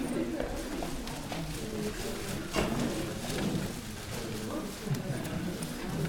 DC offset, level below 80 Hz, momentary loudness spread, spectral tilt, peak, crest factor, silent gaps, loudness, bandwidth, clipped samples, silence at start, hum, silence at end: under 0.1%; -46 dBFS; 5 LU; -5 dB/octave; -16 dBFS; 18 dB; none; -35 LUFS; 20 kHz; under 0.1%; 0 s; none; 0 s